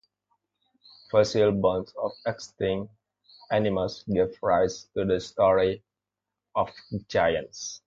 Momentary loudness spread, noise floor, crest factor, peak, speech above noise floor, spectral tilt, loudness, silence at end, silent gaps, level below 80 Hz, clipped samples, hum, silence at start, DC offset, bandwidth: 11 LU; -87 dBFS; 20 dB; -8 dBFS; 62 dB; -5.5 dB/octave; -26 LUFS; 0.1 s; none; -54 dBFS; under 0.1%; 50 Hz at -50 dBFS; 1.15 s; under 0.1%; 7.8 kHz